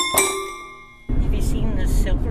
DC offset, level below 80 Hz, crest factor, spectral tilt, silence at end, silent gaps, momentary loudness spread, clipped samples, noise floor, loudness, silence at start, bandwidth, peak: under 0.1%; -22 dBFS; 18 dB; -3.5 dB/octave; 0 s; none; 18 LU; under 0.1%; -40 dBFS; -23 LUFS; 0 s; 16 kHz; -2 dBFS